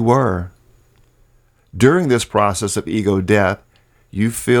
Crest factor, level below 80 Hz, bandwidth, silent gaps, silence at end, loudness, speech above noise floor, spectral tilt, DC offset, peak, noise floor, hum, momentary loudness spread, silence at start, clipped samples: 18 dB; -46 dBFS; 19 kHz; none; 0 s; -17 LUFS; 39 dB; -5.5 dB/octave; under 0.1%; 0 dBFS; -55 dBFS; none; 14 LU; 0 s; under 0.1%